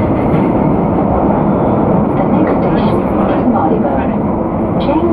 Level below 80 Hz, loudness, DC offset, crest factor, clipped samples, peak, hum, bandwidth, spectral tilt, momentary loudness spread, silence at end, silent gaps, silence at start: -28 dBFS; -13 LUFS; under 0.1%; 12 dB; under 0.1%; 0 dBFS; none; 4.9 kHz; -10.5 dB/octave; 3 LU; 0 s; none; 0 s